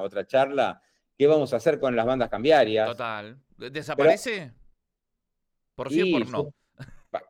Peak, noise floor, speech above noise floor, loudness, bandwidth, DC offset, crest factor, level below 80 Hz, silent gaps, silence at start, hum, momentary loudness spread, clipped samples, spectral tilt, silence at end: -8 dBFS; -81 dBFS; 57 dB; -24 LUFS; 14.5 kHz; under 0.1%; 16 dB; -58 dBFS; none; 0 s; none; 16 LU; under 0.1%; -5.5 dB/octave; 0.1 s